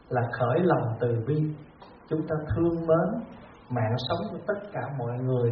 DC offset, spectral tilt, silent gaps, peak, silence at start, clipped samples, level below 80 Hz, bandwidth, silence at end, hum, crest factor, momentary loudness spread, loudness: under 0.1%; -7 dB/octave; none; -10 dBFS; 0.1 s; under 0.1%; -52 dBFS; 5.2 kHz; 0 s; none; 18 dB; 10 LU; -28 LUFS